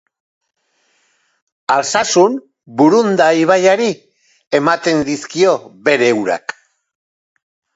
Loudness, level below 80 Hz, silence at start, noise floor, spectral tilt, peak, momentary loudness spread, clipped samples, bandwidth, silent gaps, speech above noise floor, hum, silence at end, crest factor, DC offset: -14 LUFS; -60 dBFS; 1.7 s; -62 dBFS; -4 dB/octave; 0 dBFS; 12 LU; under 0.1%; 8 kHz; 4.47-4.51 s; 48 dB; none; 1.35 s; 16 dB; under 0.1%